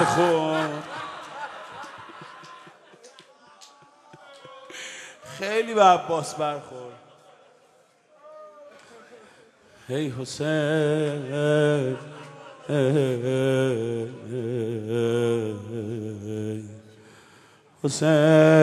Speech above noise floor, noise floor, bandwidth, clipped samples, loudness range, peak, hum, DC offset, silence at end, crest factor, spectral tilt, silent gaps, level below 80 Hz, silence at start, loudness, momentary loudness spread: 37 dB; -59 dBFS; 13 kHz; under 0.1%; 17 LU; -4 dBFS; none; under 0.1%; 0 s; 22 dB; -6 dB/octave; none; -70 dBFS; 0 s; -24 LUFS; 23 LU